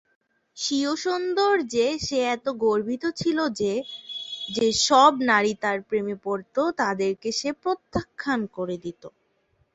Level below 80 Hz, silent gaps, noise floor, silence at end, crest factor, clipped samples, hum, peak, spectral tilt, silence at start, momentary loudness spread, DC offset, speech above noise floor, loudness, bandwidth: -58 dBFS; none; -68 dBFS; 0.65 s; 22 dB; under 0.1%; none; -4 dBFS; -3.5 dB/octave; 0.55 s; 12 LU; under 0.1%; 44 dB; -24 LUFS; 8.2 kHz